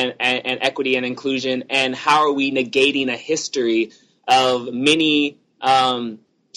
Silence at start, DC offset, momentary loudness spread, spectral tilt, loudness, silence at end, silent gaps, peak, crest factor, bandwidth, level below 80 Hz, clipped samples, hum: 0 s; under 0.1%; 7 LU; -3 dB/octave; -18 LUFS; 0.4 s; none; -2 dBFS; 18 dB; 12 kHz; -64 dBFS; under 0.1%; none